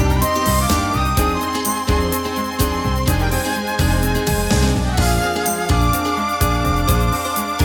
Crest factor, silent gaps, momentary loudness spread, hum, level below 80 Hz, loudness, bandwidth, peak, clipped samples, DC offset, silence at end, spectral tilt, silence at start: 14 dB; none; 3 LU; none; -24 dBFS; -18 LUFS; 20 kHz; -4 dBFS; under 0.1%; under 0.1%; 0 s; -4.5 dB/octave; 0 s